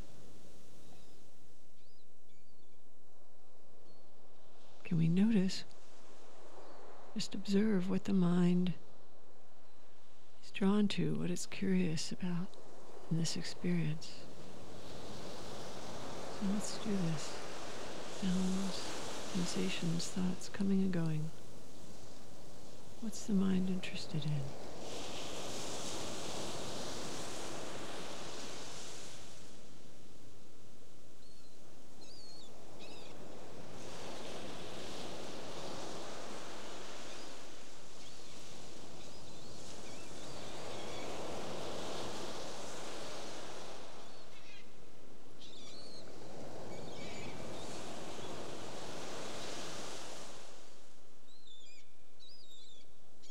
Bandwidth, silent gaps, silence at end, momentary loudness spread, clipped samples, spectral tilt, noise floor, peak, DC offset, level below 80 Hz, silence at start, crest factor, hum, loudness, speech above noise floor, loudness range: 15.5 kHz; none; 0 s; 24 LU; under 0.1%; -5.5 dB/octave; -69 dBFS; -20 dBFS; 2%; -68 dBFS; 0 s; 20 dB; none; -40 LUFS; 33 dB; 15 LU